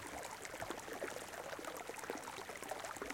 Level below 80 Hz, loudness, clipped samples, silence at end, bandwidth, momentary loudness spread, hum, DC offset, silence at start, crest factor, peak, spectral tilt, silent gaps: -70 dBFS; -46 LUFS; under 0.1%; 0 s; 17 kHz; 2 LU; none; under 0.1%; 0 s; 22 dB; -26 dBFS; -2.5 dB/octave; none